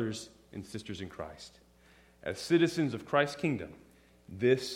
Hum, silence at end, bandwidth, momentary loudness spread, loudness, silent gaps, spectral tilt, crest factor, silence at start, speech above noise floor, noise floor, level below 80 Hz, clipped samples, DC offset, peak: none; 0 s; 15.5 kHz; 19 LU; -32 LUFS; none; -5.5 dB/octave; 20 dB; 0 s; 29 dB; -62 dBFS; -64 dBFS; under 0.1%; under 0.1%; -12 dBFS